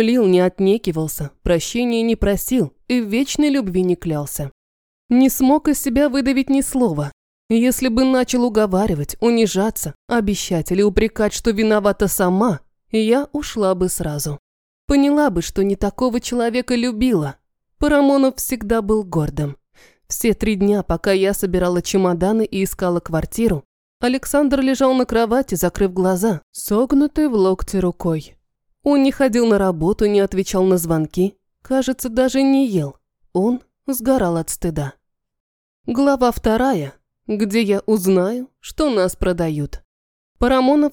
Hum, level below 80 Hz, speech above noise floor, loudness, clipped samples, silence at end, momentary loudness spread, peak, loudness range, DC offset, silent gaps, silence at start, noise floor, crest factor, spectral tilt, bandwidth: none; -36 dBFS; 36 dB; -18 LUFS; under 0.1%; 0 s; 8 LU; -2 dBFS; 2 LU; under 0.1%; 4.52-5.09 s, 7.13-7.49 s, 9.95-10.08 s, 14.39-14.88 s, 23.65-24.00 s, 26.43-26.53 s, 35.40-35.84 s, 39.85-40.35 s; 0 s; -53 dBFS; 16 dB; -5.5 dB/octave; 19.5 kHz